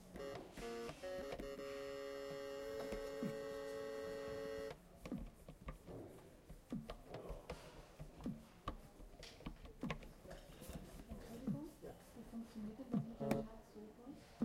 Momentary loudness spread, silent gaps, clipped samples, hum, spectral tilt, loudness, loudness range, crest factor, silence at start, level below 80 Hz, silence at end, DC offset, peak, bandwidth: 13 LU; none; under 0.1%; none; -6 dB/octave; -50 LUFS; 6 LU; 26 dB; 0 s; -62 dBFS; 0 s; under 0.1%; -22 dBFS; 16 kHz